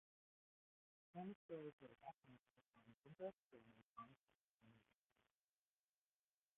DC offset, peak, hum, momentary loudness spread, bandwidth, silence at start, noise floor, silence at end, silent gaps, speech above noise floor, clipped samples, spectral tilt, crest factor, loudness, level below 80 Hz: under 0.1%; -40 dBFS; none; 10 LU; 3.8 kHz; 1.15 s; under -90 dBFS; 1.75 s; 1.35-1.49 s, 1.73-1.78 s, 2.40-2.44 s, 2.94-3.02 s, 3.43-3.47 s, 3.83-3.94 s, 4.20-4.27 s, 4.35-4.60 s; over 29 dB; under 0.1%; -5 dB/octave; 24 dB; -59 LUFS; under -90 dBFS